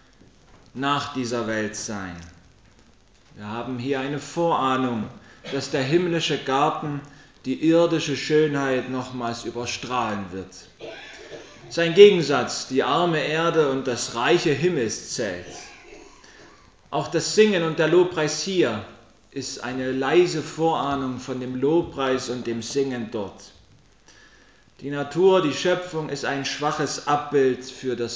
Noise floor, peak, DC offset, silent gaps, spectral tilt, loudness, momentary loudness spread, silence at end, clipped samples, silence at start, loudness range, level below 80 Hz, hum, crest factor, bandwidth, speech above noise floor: -55 dBFS; 0 dBFS; under 0.1%; none; -4.5 dB/octave; -23 LUFS; 17 LU; 0 s; under 0.1%; 0.75 s; 9 LU; -58 dBFS; none; 24 dB; 8 kHz; 33 dB